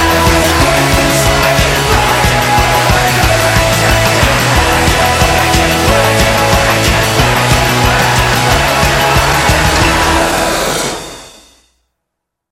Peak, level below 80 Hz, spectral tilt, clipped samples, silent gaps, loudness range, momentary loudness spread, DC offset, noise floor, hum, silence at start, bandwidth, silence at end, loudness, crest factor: 0 dBFS; -20 dBFS; -3.5 dB/octave; under 0.1%; none; 2 LU; 1 LU; under 0.1%; -75 dBFS; none; 0 s; 17 kHz; 1.2 s; -9 LUFS; 10 dB